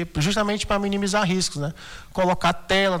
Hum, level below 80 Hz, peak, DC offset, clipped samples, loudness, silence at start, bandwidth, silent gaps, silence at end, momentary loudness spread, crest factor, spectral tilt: none; -42 dBFS; -10 dBFS; under 0.1%; under 0.1%; -23 LUFS; 0 s; 19 kHz; none; 0 s; 10 LU; 14 dB; -4.5 dB/octave